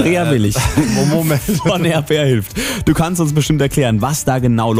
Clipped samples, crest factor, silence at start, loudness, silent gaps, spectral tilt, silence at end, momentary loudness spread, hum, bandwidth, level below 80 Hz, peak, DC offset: under 0.1%; 12 dB; 0 s; -15 LUFS; none; -5.5 dB/octave; 0 s; 2 LU; none; 16 kHz; -32 dBFS; -2 dBFS; under 0.1%